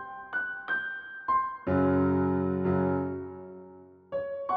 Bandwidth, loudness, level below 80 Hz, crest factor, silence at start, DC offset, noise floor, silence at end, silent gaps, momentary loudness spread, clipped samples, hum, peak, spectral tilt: 4.8 kHz; -29 LUFS; -60 dBFS; 14 dB; 0 s; under 0.1%; -51 dBFS; 0 s; none; 14 LU; under 0.1%; none; -16 dBFS; -10.5 dB/octave